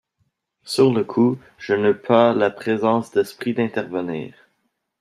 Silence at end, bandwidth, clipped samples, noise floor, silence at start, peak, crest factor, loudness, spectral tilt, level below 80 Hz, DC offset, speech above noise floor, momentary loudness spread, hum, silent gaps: 0.7 s; 14.5 kHz; under 0.1%; -72 dBFS; 0.65 s; -2 dBFS; 18 dB; -20 LUFS; -6.5 dB/octave; -66 dBFS; under 0.1%; 52 dB; 11 LU; none; none